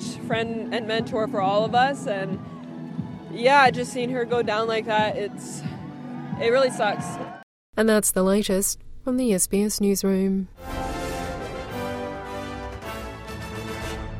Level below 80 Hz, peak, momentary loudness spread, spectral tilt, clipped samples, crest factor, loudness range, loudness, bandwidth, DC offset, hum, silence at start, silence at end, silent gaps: -46 dBFS; -4 dBFS; 14 LU; -4 dB/octave; under 0.1%; 20 dB; 6 LU; -24 LUFS; 16 kHz; under 0.1%; none; 0 s; 0 s; 7.43-7.73 s